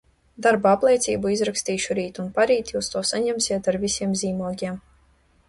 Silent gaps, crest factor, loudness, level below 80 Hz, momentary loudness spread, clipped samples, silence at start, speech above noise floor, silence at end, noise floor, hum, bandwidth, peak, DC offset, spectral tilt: none; 18 dB; -23 LUFS; -54 dBFS; 9 LU; under 0.1%; 0.4 s; 37 dB; 0.7 s; -60 dBFS; none; 11.5 kHz; -4 dBFS; under 0.1%; -3.5 dB/octave